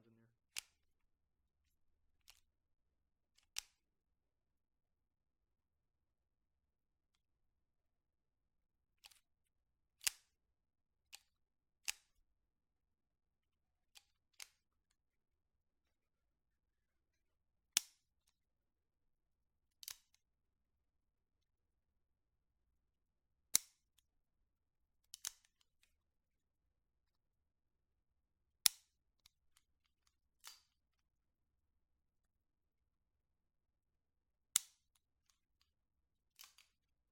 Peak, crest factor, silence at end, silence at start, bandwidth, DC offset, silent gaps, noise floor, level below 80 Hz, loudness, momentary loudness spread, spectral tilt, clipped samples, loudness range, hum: -6 dBFS; 48 dB; 2.5 s; 0.55 s; 16 kHz; under 0.1%; none; under -90 dBFS; -86 dBFS; -41 LUFS; 26 LU; 2.5 dB/octave; under 0.1%; 22 LU; none